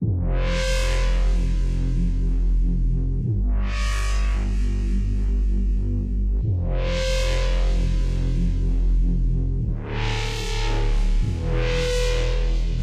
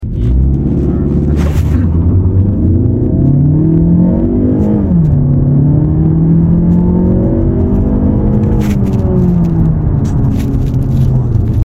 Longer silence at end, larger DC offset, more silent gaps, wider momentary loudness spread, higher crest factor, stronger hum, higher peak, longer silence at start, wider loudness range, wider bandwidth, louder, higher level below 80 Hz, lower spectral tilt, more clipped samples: about the same, 0 s vs 0 s; neither; neither; about the same, 2 LU vs 3 LU; about the same, 10 dB vs 8 dB; neither; second, -12 dBFS vs 0 dBFS; about the same, 0 s vs 0 s; about the same, 1 LU vs 2 LU; first, 9.8 kHz vs 7.8 kHz; second, -25 LUFS vs -11 LUFS; about the same, -22 dBFS vs -18 dBFS; second, -5.5 dB/octave vs -10.5 dB/octave; neither